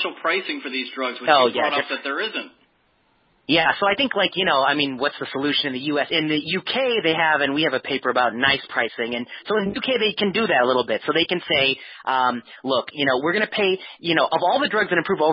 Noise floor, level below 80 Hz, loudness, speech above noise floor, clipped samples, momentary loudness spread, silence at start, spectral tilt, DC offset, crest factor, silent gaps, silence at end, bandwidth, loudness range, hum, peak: -64 dBFS; -60 dBFS; -21 LUFS; 42 dB; under 0.1%; 7 LU; 0 s; -9 dB/octave; under 0.1%; 20 dB; none; 0 s; 5.6 kHz; 1 LU; none; -2 dBFS